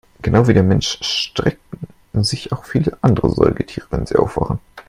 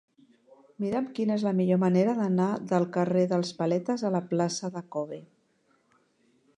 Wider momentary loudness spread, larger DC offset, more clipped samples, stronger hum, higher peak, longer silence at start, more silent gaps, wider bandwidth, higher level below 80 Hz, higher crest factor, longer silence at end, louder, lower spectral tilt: about the same, 11 LU vs 11 LU; neither; neither; neither; first, 0 dBFS vs -10 dBFS; second, 0.25 s vs 0.8 s; neither; first, 13 kHz vs 10 kHz; first, -36 dBFS vs -74 dBFS; about the same, 18 dB vs 18 dB; second, 0.05 s vs 1.35 s; first, -18 LUFS vs -28 LUFS; about the same, -6 dB/octave vs -7 dB/octave